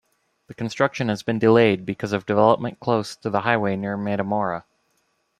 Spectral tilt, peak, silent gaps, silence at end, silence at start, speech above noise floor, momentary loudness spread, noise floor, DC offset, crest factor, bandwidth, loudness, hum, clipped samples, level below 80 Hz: -6.5 dB/octave; -2 dBFS; none; 0.8 s; 0.5 s; 48 dB; 9 LU; -69 dBFS; under 0.1%; 20 dB; 12.5 kHz; -22 LUFS; none; under 0.1%; -62 dBFS